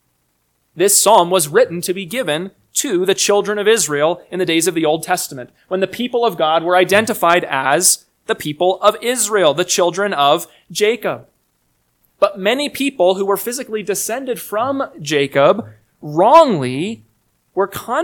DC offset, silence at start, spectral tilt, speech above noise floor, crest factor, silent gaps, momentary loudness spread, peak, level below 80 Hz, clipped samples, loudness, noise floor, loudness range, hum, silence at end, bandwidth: under 0.1%; 0.75 s; -3 dB/octave; 49 dB; 16 dB; none; 10 LU; 0 dBFS; -62 dBFS; 0.1%; -16 LUFS; -65 dBFS; 4 LU; none; 0 s; 19 kHz